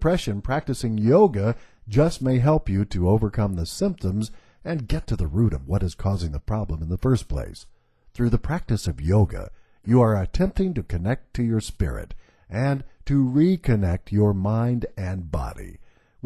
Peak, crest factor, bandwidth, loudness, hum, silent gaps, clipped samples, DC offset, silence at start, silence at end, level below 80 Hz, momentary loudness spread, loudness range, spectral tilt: -4 dBFS; 18 dB; 13 kHz; -24 LUFS; none; none; under 0.1%; under 0.1%; 0 s; 0.45 s; -34 dBFS; 11 LU; 5 LU; -8 dB/octave